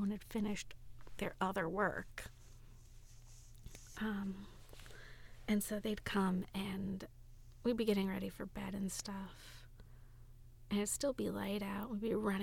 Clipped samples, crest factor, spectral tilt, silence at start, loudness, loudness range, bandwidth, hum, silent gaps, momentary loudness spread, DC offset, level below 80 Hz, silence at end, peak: under 0.1%; 20 dB; -5 dB/octave; 0 s; -40 LUFS; 5 LU; 18 kHz; none; none; 22 LU; under 0.1%; -58 dBFS; 0 s; -22 dBFS